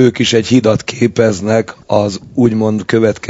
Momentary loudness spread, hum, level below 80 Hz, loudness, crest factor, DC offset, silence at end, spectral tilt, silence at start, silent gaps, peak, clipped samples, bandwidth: 5 LU; none; -46 dBFS; -13 LUFS; 12 dB; under 0.1%; 0 s; -5.5 dB/octave; 0 s; none; 0 dBFS; 0.3%; 8 kHz